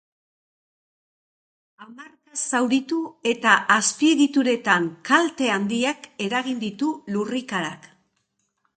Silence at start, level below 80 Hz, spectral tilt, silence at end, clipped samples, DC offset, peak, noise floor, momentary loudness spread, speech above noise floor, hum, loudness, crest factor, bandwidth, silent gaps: 1.8 s; -72 dBFS; -3 dB/octave; 0.9 s; under 0.1%; under 0.1%; -2 dBFS; -73 dBFS; 10 LU; 51 dB; none; -22 LUFS; 22 dB; 9.4 kHz; none